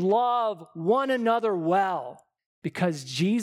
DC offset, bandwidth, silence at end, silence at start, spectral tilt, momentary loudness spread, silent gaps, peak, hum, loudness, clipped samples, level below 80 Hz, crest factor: under 0.1%; 14 kHz; 0 s; 0 s; -6 dB/octave; 11 LU; 2.46-2.62 s; -10 dBFS; none; -26 LUFS; under 0.1%; -78 dBFS; 14 dB